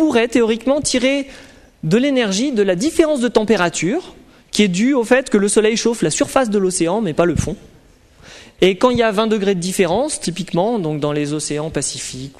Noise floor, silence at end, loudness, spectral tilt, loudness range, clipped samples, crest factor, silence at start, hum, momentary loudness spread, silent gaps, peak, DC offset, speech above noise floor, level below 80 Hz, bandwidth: -48 dBFS; 0.1 s; -17 LUFS; -4.5 dB/octave; 2 LU; under 0.1%; 16 dB; 0 s; none; 7 LU; none; -2 dBFS; under 0.1%; 31 dB; -44 dBFS; 13.5 kHz